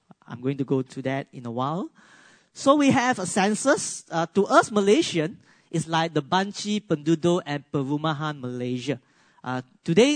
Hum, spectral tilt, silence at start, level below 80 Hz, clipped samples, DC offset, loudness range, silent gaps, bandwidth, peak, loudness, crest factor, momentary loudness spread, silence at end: none; -5 dB/octave; 0.3 s; -68 dBFS; under 0.1%; under 0.1%; 5 LU; none; 9.6 kHz; -4 dBFS; -24 LUFS; 20 dB; 13 LU; 0 s